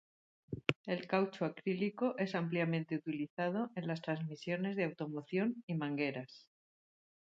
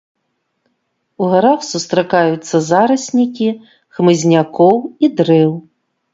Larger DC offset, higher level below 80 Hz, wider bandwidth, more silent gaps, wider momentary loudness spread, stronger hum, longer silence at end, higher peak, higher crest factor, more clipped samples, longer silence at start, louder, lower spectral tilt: neither; second, -74 dBFS vs -60 dBFS; about the same, 7.8 kHz vs 7.8 kHz; first, 0.76-0.84 s, 3.30-3.37 s, 5.63-5.68 s vs none; second, 5 LU vs 8 LU; neither; first, 0.85 s vs 0.55 s; second, -12 dBFS vs 0 dBFS; first, 28 dB vs 14 dB; neither; second, 0.5 s vs 1.2 s; second, -38 LUFS vs -14 LUFS; first, -7.5 dB/octave vs -6 dB/octave